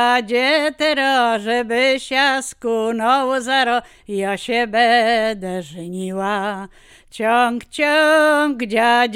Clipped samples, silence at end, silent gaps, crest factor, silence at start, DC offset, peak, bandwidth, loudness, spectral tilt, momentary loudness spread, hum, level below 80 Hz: under 0.1%; 0 s; none; 14 dB; 0 s; under 0.1%; -4 dBFS; 16 kHz; -17 LUFS; -3.5 dB/octave; 11 LU; none; -56 dBFS